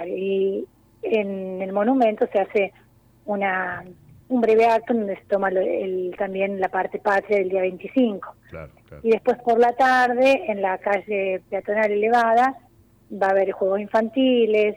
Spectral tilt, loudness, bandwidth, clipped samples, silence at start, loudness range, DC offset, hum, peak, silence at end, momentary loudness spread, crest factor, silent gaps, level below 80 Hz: -6 dB/octave; -21 LUFS; 11.5 kHz; under 0.1%; 0 s; 4 LU; under 0.1%; none; -8 dBFS; 0 s; 11 LU; 14 dB; none; -60 dBFS